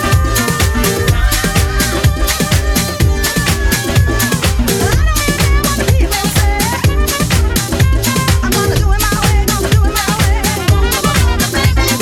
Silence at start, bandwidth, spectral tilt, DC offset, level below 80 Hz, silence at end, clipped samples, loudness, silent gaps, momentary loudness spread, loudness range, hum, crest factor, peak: 0 s; 19 kHz; -4 dB/octave; under 0.1%; -16 dBFS; 0 s; under 0.1%; -13 LUFS; none; 1 LU; 1 LU; none; 12 dB; 0 dBFS